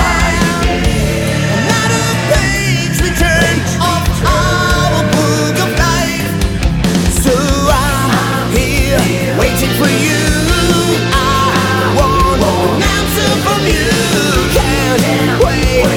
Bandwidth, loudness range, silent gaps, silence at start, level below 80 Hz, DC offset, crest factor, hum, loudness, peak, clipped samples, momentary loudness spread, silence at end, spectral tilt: 18 kHz; 1 LU; none; 0 s; -20 dBFS; under 0.1%; 12 dB; none; -12 LUFS; 0 dBFS; under 0.1%; 2 LU; 0 s; -4.5 dB/octave